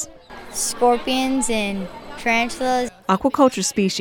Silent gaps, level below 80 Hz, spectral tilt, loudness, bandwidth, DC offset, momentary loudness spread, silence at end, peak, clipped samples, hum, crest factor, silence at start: none; -44 dBFS; -3.5 dB/octave; -20 LUFS; 18 kHz; under 0.1%; 13 LU; 0 s; -4 dBFS; under 0.1%; none; 18 dB; 0 s